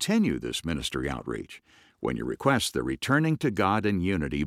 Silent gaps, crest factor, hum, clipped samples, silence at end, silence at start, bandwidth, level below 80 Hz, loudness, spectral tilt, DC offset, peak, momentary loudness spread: none; 20 dB; none; under 0.1%; 0 s; 0 s; 16 kHz; -48 dBFS; -27 LUFS; -5 dB/octave; under 0.1%; -8 dBFS; 10 LU